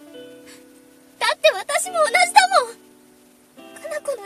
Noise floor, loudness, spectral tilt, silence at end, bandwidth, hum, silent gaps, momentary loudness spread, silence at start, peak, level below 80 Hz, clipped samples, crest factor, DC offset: -52 dBFS; -18 LUFS; 1 dB/octave; 0 s; 14 kHz; none; none; 17 LU; 0.15 s; 0 dBFS; -68 dBFS; under 0.1%; 22 dB; under 0.1%